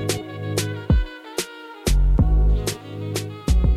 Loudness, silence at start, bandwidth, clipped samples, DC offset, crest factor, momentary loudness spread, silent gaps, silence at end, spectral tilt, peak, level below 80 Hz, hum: -23 LUFS; 0 s; 15 kHz; under 0.1%; under 0.1%; 14 dB; 10 LU; none; 0 s; -5.5 dB/octave; -6 dBFS; -22 dBFS; none